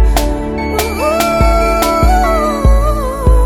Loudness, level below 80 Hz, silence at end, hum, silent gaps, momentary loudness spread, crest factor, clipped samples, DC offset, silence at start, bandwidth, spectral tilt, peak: -13 LUFS; -14 dBFS; 0 s; none; none; 5 LU; 10 dB; under 0.1%; under 0.1%; 0 s; 16 kHz; -5.5 dB/octave; 0 dBFS